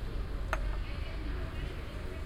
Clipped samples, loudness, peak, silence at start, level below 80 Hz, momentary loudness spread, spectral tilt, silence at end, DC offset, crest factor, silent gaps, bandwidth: under 0.1%; -39 LUFS; -12 dBFS; 0 s; -38 dBFS; 5 LU; -6 dB/octave; 0 s; under 0.1%; 24 dB; none; 13.5 kHz